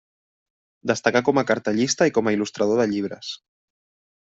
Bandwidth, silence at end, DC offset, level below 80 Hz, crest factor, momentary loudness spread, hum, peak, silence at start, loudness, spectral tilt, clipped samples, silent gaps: 8.2 kHz; 0.85 s; under 0.1%; -64 dBFS; 20 dB; 13 LU; none; -2 dBFS; 0.85 s; -21 LUFS; -4.5 dB/octave; under 0.1%; none